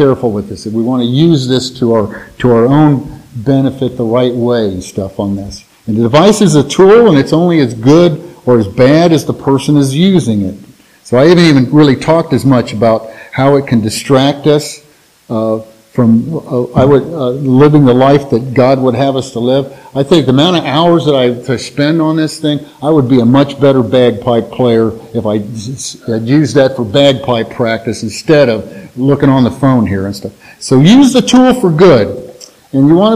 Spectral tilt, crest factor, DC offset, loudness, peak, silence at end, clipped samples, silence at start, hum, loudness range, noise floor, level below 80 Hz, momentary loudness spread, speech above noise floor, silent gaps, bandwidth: -6.5 dB/octave; 10 dB; under 0.1%; -10 LUFS; 0 dBFS; 0 s; 1%; 0 s; none; 4 LU; -33 dBFS; -42 dBFS; 12 LU; 24 dB; none; 14.5 kHz